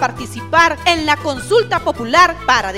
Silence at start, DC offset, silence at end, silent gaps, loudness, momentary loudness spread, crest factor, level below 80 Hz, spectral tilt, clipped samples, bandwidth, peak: 0 s; 0.6%; 0 s; none; -14 LUFS; 7 LU; 16 dB; -38 dBFS; -3.5 dB/octave; under 0.1%; 16.5 kHz; 0 dBFS